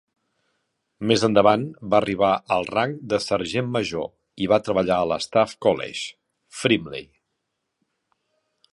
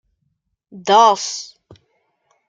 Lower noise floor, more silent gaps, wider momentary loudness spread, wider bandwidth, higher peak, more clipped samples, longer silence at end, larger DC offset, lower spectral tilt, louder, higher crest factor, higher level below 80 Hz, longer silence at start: first, -78 dBFS vs -70 dBFS; neither; second, 13 LU vs 18 LU; first, 11.5 kHz vs 9.2 kHz; about the same, -2 dBFS vs -2 dBFS; neither; first, 1.7 s vs 1.05 s; neither; first, -5 dB/octave vs -2 dB/octave; second, -22 LUFS vs -14 LUFS; about the same, 22 dB vs 18 dB; first, -56 dBFS vs -70 dBFS; first, 1 s vs 0.75 s